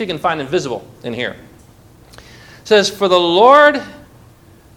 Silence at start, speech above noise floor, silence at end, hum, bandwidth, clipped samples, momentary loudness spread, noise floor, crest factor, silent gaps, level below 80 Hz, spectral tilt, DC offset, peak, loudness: 0 s; 31 dB; 0.8 s; none; 17 kHz; 0.3%; 18 LU; -45 dBFS; 16 dB; none; -52 dBFS; -4 dB/octave; under 0.1%; 0 dBFS; -13 LUFS